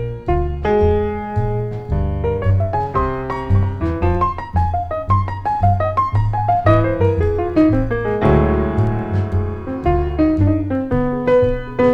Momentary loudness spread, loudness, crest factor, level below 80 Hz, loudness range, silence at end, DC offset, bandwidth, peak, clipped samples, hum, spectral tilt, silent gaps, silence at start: 6 LU; -18 LUFS; 14 dB; -26 dBFS; 3 LU; 0 s; under 0.1%; 5.6 kHz; -2 dBFS; under 0.1%; none; -10 dB/octave; none; 0 s